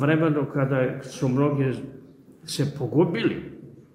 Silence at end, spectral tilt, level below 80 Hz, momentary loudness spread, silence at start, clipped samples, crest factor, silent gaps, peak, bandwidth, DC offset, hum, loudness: 0.15 s; -7 dB/octave; -60 dBFS; 17 LU; 0 s; under 0.1%; 16 dB; none; -10 dBFS; 13 kHz; under 0.1%; none; -25 LUFS